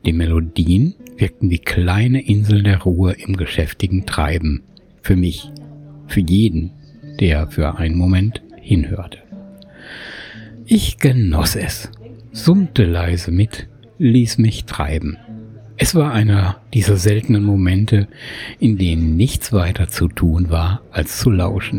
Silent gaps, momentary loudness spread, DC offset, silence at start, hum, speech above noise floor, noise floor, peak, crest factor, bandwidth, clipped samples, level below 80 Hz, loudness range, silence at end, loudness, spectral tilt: none; 18 LU; under 0.1%; 0.05 s; none; 23 dB; -38 dBFS; -2 dBFS; 14 dB; 17 kHz; under 0.1%; -28 dBFS; 4 LU; 0 s; -17 LUFS; -6.5 dB/octave